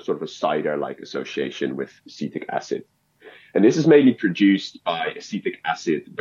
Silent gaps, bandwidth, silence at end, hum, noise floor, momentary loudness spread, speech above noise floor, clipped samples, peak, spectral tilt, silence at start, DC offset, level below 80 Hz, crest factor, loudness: none; 7.4 kHz; 0 s; none; -48 dBFS; 16 LU; 27 dB; under 0.1%; -4 dBFS; -6 dB/octave; 0.1 s; under 0.1%; -74 dBFS; 18 dB; -22 LUFS